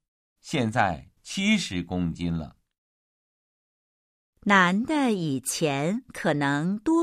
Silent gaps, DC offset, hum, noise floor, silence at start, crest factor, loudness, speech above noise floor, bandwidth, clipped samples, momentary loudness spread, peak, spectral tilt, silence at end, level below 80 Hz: 2.78-4.33 s; under 0.1%; none; under -90 dBFS; 0.45 s; 20 dB; -25 LUFS; over 65 dB; 15.5 kHz; under 0.1%; 11 LU; -6 dBFS; -5 dB/octave; 0 s; -54 dBFS